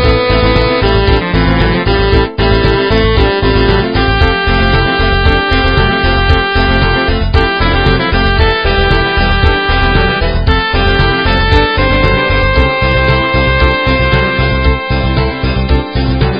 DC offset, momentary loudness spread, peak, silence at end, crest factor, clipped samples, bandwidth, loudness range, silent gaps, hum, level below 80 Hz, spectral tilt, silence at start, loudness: 0.8%; 2 LU; 0 dBFS; 0 s; 10 dB; 0.3%; 5.6 kHz; 1 LU; none; none; -14 dBFS; -8 dB/octave; 0 s; -11 LUFS